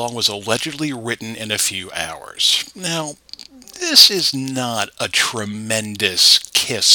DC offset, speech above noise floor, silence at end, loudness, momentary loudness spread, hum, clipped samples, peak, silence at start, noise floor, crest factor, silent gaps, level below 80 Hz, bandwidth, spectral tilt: under 0.1%; 21 dB; 0 s; -16 LUFS; 16 LU; none; under 0.1%; 0 dBFS; 0 s; -39 dBFS; 18 dB; none; -58 dBFS; 19 kHz; -1.5 dB/octave